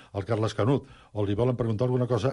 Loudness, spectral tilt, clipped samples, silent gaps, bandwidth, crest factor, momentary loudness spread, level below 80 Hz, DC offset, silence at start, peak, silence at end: -27 LUFS; -8 dB/octave; under 0.1%; none; 11 kHz; 14 dB; 5 LU; -50 dBFS; under 0.1%; 0.15 s; -12 dBFS; 0 s